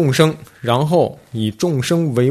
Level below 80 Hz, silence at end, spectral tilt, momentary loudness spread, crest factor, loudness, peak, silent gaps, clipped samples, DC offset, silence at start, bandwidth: -52 dBFS; 0 s; -6 dB/octave; 8 LU; 16 dB; -18 LUFS; 0 dBFS; none; under 0.1%; under 0.1%; 0 s; 14 kHz